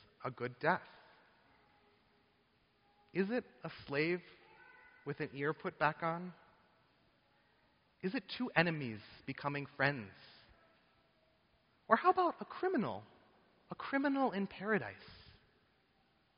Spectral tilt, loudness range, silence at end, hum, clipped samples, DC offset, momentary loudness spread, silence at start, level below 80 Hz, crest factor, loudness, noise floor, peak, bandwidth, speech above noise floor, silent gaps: -4 dB/octave; 6 LU; 1.15 s; none; under 0.1%; under 0.1%; 16 LU; 0.2 s; -76 dBFS; 28 dB; -37 LUFS; -74 dBFS; -12 dBFS; 5.4 kHz; 37 dB; none